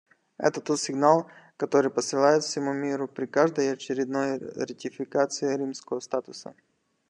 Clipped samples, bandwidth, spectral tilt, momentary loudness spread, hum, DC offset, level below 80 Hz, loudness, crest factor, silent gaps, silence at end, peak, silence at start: under 0.1%; 10.5 kHz; -4.5 dB/octave; 12 LU; none; under 0.1%; -80 dBFS; -27 LUFS; 20 dB; none; 0.6 s; -6 dBFS; 0.4 s